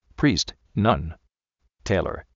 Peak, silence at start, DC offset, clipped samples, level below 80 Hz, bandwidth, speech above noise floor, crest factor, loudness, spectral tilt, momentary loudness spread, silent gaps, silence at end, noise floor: -6 dBFS; 0.2 s; under 0.1%; under 0.1%; -42 dBFS; 7.6 kHz; 50 dB; 20 dB; -24 LUFS; -5 dB/octave; 11 LU; none; 0.15 s; -73 dBFS